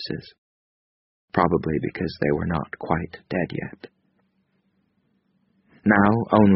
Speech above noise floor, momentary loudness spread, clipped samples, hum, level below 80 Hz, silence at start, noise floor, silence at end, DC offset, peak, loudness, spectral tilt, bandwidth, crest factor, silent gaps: 47 dB; 15 LU; under 0.1%; none; -48 dBFS; 0 s; -69 dBFS; 0 s; under 0.1%; -2 dBFS; -23 LUFS; -6 dB/octave; 5.8 kHz; 22 dB; 0.38-1.28 s